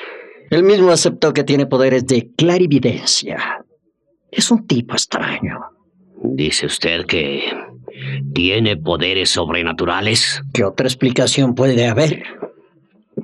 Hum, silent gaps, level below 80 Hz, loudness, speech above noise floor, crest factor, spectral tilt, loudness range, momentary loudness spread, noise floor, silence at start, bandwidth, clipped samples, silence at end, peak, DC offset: none; none; -52 dBFS; -16 LUFS; 48 dB; 14 dB; -4 dB/octave; 5 LU; 13 LU; -64 dBFS; 0 s; 13 kHz; under 0.1%; 0 s; -2 dBFS; under 0.1%